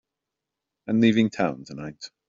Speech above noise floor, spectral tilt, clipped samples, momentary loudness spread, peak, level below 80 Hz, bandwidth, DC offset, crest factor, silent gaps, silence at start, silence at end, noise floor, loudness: 62 dB; -5.5 dB/octave; under 0.1%; 18 LU; -8 dBFS; -64 dBFS; 7.4 kHz; under 0.1%; 18 dB; none; 0.9 s; 0.2 s; -85 dBFS; -23 LUFS